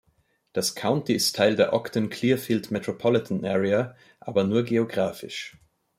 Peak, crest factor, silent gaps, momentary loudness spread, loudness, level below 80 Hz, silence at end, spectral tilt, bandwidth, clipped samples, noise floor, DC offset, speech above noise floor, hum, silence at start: -8 dBFS; 18 dB; none; 13 LU; -25 LUFS; -66 dBFS; 0.5 s; -5 dB/octave; 16.5 kHz; under 0.1%; -68 dBFS; under 0.1%; 43 dB; none; 0.55 s